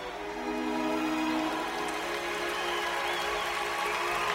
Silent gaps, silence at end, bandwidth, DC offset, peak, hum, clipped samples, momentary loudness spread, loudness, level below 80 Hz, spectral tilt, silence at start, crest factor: none; 0 s; 16 kHz; under 0.1%; -16 dBFS; none; under 0.1%; 3 LU; -31 LUFS; -58 dBFS; -2.5 dB/octave; 0 s; 16 dB